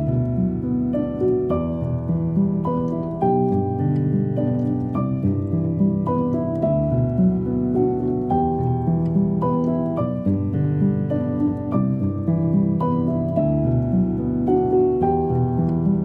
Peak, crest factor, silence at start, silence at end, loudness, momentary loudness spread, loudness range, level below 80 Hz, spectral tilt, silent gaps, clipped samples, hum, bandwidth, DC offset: -8 dBFS; 12 dB; 0 s; 0 s; -21 LUFS; 3 LU; 2 LU; -40 dBFS; -12.5 dB/octave; none; under 0.1%; none; 3.4 kHz; under 0.1%